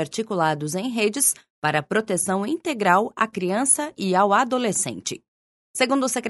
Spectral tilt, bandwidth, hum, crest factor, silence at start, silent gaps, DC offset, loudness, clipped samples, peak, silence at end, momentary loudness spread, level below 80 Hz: -3.5 dB/octave; 12 kHz; none; 20 dB; 0 s; 1.50-1.62 s, 5.28-5.74 s; under 0.1%; -22 LUFS; under 0.1%; -2 dBFS; 0 s; 7 LU; -68 dBFS